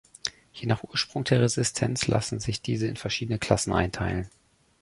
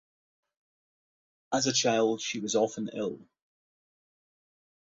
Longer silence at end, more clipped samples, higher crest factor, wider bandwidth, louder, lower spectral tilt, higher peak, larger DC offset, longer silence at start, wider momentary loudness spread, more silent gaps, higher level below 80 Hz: second, 0.55 s vs 1.65 s; neither; about the same, 24 dB vs 20 dB; first, 11.5 kHz vs 8 kHz; about the same, -27 LUFS vs -29 LUFS; first, -4.5 dB/octave vs -3 dB/octave; first, -4 dBFS vs -14 dBFS; neither; second, 0.25 s vs 1.5 s; about the same, 11 LU vs 11 LU; neither; first, -46 dBFS vs -74 dBFS